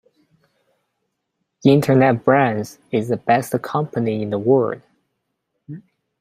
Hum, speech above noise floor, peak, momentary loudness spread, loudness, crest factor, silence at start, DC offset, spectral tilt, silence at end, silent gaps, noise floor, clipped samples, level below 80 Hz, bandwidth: none; 58 dB; -2 dBFS; 20 LU; -18 LUFS; 20 dB; 1.65 s; under 0.1%; -7.5 dB/octave; 0.4 s; none; -75 dBFS; under 0.1%; -60 dBFS; 16 kHz